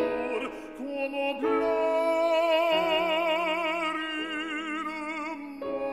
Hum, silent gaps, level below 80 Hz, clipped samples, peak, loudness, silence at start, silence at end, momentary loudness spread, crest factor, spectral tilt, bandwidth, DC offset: none; none; -64 dBFS; under 0.1%; -14 dBFS; -28 LUFS; 0 s; 0 s; 11 LU; 14 dB; -3.5 dB/octave; 14 kHz; under 0.1%